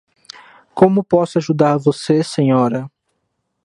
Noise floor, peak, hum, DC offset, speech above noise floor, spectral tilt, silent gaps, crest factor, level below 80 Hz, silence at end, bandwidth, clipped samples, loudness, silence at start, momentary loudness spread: -71 dBFS; 0 dBFS; none; under 0.1%; 56 dB; -7 dB/octave; none; 16 dB; -58 dBFS; 0.75 s; 11.5 kHz; under 0.1%; -16 LUFS; 0.75 s; 9 LU